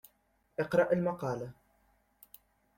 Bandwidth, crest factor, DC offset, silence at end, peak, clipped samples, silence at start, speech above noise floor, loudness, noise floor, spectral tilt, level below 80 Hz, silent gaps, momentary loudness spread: 16.5 kHz; 20 dB; under 0.1%; 1.25 s; -16 dBFS; under 0.1%; 0.6 s; 42 dB; -32 LUFS; -73 dBFS; -7.5 dB/octave; -68 dBFS; none; 15 LU